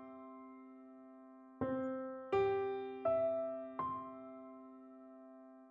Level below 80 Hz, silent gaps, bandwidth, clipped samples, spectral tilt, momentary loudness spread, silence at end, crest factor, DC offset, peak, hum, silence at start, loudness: -76 dBFS; none; 5.4 kHz; under 0.1%; -5.5 dB/octave; 22 LU; 0 s; 18 dB; under 0.1%; -24 dBFS; none; 0 s; -39 LUFS